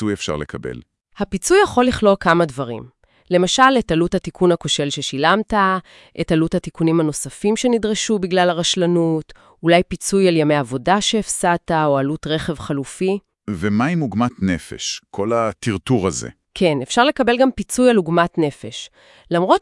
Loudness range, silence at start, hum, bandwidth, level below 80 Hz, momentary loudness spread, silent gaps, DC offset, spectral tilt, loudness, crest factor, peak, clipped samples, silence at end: 4 LU; 0 s; none; 12 kHz; -46 dBFS; 11 LU; none; under 0.1%; -4.5 dB/octave; -18 LUFS; 18 dB; 0 dBFS; under 0.1%; 0 s